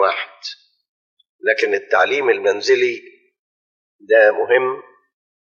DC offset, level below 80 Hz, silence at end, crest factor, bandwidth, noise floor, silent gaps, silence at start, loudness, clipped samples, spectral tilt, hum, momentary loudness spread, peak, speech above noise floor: under 0.1%; -80 dBFS; 0.65 s; 18 dB; 7.2 kHz; under -90 dBFS; 0.89-1.17 s, 1.29-1.39 s, 3.39-3.99 s; 0 s; -17 LUFS; under 0.1%; 0 dB/octave; none; 18 LU; -2 dBFS; over 73 dB